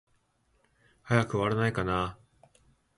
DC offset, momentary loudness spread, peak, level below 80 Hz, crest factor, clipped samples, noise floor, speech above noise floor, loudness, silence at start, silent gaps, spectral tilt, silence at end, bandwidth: under 0.1%; 5 LU; -8 dBFS; -54 dBFS; 24 dB; under 0.1%; -71 dBFS; 43 dB; -29 LUFS; 1.05 s; none; -6.5 dB/octave; 0.85 s; 11.5 kHz